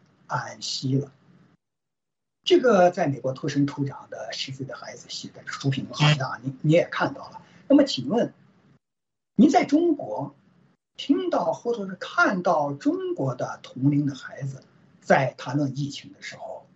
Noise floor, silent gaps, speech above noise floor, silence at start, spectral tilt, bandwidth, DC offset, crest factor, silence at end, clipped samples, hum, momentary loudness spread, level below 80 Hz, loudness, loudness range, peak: -89 dBFS; none; 65 dB; 0.3 s; -6 dB/octave; 8 kHz; under 0.1%; 20 dB; 0.15 s; under 0.1%; none; 17 LU; -70 dBFS; -24 LUFS; 4 LU; -6 dBFS